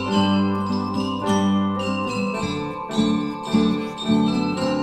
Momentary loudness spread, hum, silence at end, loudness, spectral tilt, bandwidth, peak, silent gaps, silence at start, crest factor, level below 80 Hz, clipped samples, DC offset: 5 LU; none; 0 s; -22 LUFS; -6 dB/octave; 10.5 kHz; -6 dBFS; none; 0 s; 14 dB; -52 dBFS; under 0.1%; under 0.1%